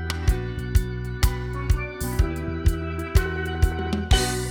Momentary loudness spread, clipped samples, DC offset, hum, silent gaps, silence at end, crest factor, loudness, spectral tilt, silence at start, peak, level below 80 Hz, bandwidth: 6 LU; under 0.1%; under 0.1%; none; none; 0 s; 18 dB; -25 LUFS; -5 dB/octave; 0 s; -4 dBFS; -26 dBFS; over 20 kHz